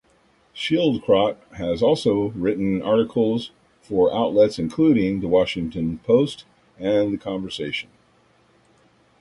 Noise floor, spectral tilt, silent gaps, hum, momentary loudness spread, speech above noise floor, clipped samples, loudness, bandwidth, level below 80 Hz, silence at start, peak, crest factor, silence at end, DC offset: -59 dBFS; -7 dB/octave; none; none; 10 LU; 39 dB; under 0.1%; -21 LUFS; 11.5 kHz; -50 dBFS; 0.55 s; -4 dBFS; 18 dB; 1.4 s; under 0.1%